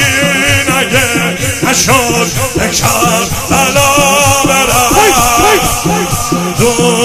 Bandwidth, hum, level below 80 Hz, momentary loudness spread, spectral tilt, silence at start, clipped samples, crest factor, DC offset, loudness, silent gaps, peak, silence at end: 16.5 kHz; none; -28 dBFS; 6 LU; -3 dB/octave; 0 s; 0.4%; 10 dB; under 0.1%; -9 LUFS; none; 0 dBFS; 0 s